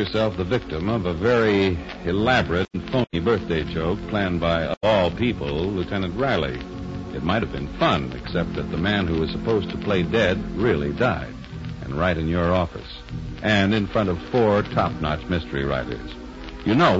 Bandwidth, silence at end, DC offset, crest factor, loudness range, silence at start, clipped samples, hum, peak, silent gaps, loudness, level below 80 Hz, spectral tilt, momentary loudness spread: 8 kHz; 0 s; under 0.1%; 18 dB; 2 LU; 0 s; under 0.1%; none; -6 dBFS; 4.77-4.81 s; -23 LUFS; -38 dBFS; -7 dB/octave; 11 LU